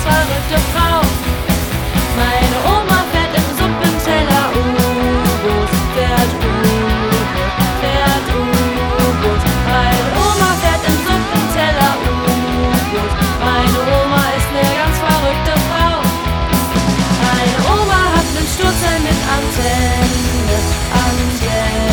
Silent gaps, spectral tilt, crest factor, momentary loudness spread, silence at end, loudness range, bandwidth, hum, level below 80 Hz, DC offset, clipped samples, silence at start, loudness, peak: none; -4.5 dB/octave; 14 dB; 3 LU; 0 s; 1 LU; over 20 kHz; none; -22 dBFS; under 0.1%; under 0.1%; 0 s; -14 LUFS; 0 dBFS